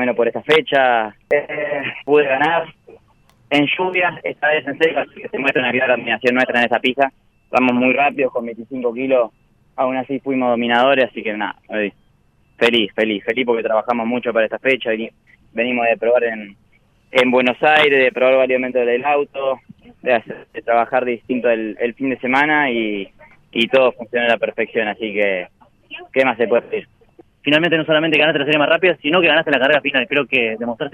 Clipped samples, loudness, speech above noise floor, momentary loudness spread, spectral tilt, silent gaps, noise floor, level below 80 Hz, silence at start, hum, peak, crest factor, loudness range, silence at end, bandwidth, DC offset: under 0.1%; -17 LUFS; 40 dB; 10 LU; -5.5 dB/octave; none; -57 dBFS; -60 dBFS; 0 s; none; -2 dBFS; 16 dB; 4 LU; 0.05 s; 10.5 kHz; under 0.1%